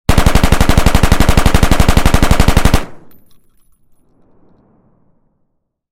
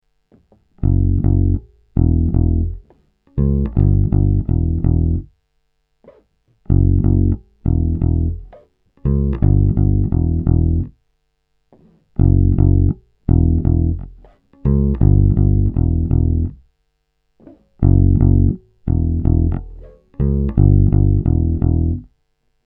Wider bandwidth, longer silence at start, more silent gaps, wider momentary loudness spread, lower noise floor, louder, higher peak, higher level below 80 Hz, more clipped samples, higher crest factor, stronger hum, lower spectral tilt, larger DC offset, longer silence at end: first, 16.5 kHz vs 2 kHz; second, 0.05 s vs 0.8 s; neither; second, 2 LU vs 9 LU; second, -64 dBFS vs -68 dBFS; first, -12 LUFS vs -17 LUFS; about the same, 0 dBFS vs 0 dBFS; first, -14 dBFS vs -22 dBFS; first, 1% vs under 0.1%; about the same, 12 dB vs 16 dB; neither; second, -5 dB/octave vs -15 dB/octave; neither; second, 0.35 s vs 0.65 s